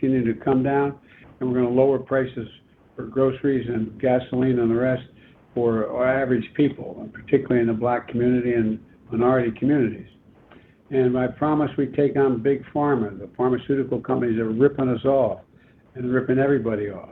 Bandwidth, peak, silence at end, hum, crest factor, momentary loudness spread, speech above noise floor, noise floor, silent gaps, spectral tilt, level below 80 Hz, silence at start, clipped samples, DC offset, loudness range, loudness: 4.1 kHz; -6 dBFS; 0 s; none; 18 dB; 10 LU; 32 dB; -53 dBFS; none; -11 dB/octave; -54 dBFS; 0 s; under 0.1%; under 0.1%; 1 LU; -22 LUFS